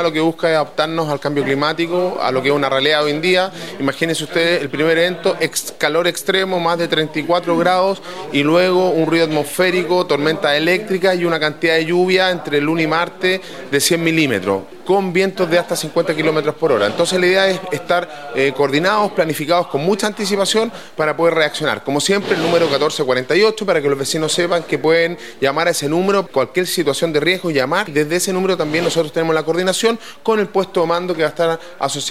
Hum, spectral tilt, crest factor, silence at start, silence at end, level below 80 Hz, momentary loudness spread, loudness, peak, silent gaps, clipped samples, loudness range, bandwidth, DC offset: none; -4 dB/octave; 16 dB; 0 s; 0 s; -60 dBFS; 5 LU; -16 LUFS; 0 dBFS; none; under 0.1%; 1 LU; 16 kHz; 0.7%